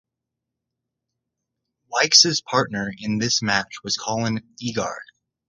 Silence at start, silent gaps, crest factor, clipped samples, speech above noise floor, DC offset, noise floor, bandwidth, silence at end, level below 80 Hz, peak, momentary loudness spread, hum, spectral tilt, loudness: 1.9 s; none; 24 dB; under 0.1%; 62 dB; under 0.1%; -84 dBFS; 11 kHz; 0.45 s; -58 dBFS; 0 dBFS; 15 LU; none; -2 dB/octave; -20 LUFS